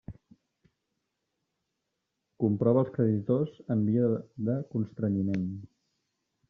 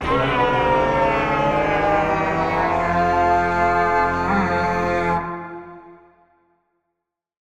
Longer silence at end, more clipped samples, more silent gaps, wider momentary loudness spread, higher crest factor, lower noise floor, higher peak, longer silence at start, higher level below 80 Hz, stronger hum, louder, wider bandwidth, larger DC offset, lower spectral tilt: second, 0.85 s vs 1.55 s; neither; neither; first, 8 LU vs 4 LU; about the same, 18 dB vs 14 dB; about the same, -83 dBFS vs -80 dBFS; second, -12 dBFS vs -6 dBFS; about the same, 0.1 s vs 0 s; second, -66 dBFS vs -40 dBFS; neither; second, -29 LUFS vs -19 LUFS; second, 5.6 kHz vs 11.5 kHz; neither; first, -11 dB/octave vs -6.5 dB/octave